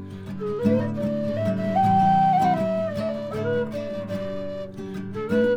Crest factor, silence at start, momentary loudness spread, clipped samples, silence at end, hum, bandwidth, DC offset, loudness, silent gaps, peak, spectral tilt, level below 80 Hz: 16 dB; 0 s; 14 LU; under 0.1%; 0 s; none; 13.5 kHz; under 0.1%; -24 LUFS; none; -8 dBFS; -8 dB/octave; -54 dBFS